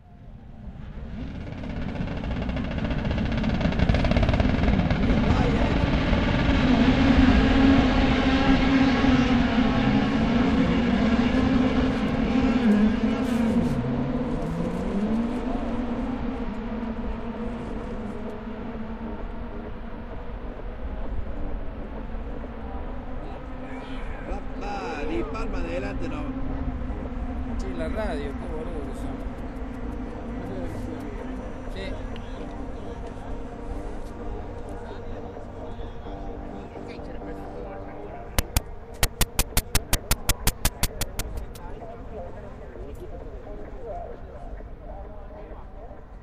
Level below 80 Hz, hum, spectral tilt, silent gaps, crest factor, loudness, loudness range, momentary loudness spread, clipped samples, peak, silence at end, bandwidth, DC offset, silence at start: -32 dBFS; none; -5.5 dB/octave; none; 22 dB; -26 LUFS; 17 LU; 18 LU; under 0.1%; -2 dBFS; 0 s; 16 kHz; under 0.1%; 0.1 s